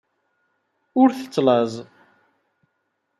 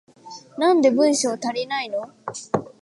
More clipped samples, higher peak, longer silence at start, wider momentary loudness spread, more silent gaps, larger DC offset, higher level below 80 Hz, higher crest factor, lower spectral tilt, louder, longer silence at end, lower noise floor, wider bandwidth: neither; about the same, -4 dBFS vs -6 dBFS; first, 0.95 s vs 0.25 s; second, 9 LU vs 19 LU; neither; neither; second, -74 dBFS vs -68 dBFS; about the same, 20 dB vs 16 dB; first, -6.5 dB/octave vs -3.5 dB/octave; about the same, -20 LUFS vs -21 LUFS; first, 1.35 s vs 0.15 s; first, -74 dBFS vs -43 dBFS; about the same, 12 kHz vs 11.5 kHz